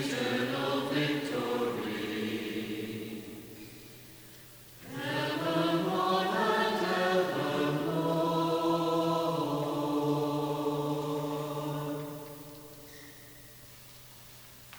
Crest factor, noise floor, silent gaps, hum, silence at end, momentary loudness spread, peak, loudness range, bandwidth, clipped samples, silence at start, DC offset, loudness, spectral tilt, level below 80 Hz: 16 dB; -52 dBFS; none; none; 0 s; 21 LU; -16 dBFS; 10 LU; over 20 kHz; under 0.1%; 0 s; under 0.1%; -31 LUFS; -5.5 dB/octave; -68 dBFS